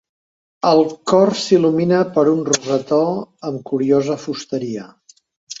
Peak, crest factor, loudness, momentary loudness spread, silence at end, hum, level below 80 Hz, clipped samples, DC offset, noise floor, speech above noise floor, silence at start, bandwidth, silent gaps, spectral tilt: -2 dBFS; 16 dB; -17 LUFS; 12 LU; 0 s; none; -60 dBFS; under 0.1%; under 0.1%; under -90 dBFS; over 73 dB; 0.65 s; 8 kHz; 5.36-5.47 s; -5 dB/octave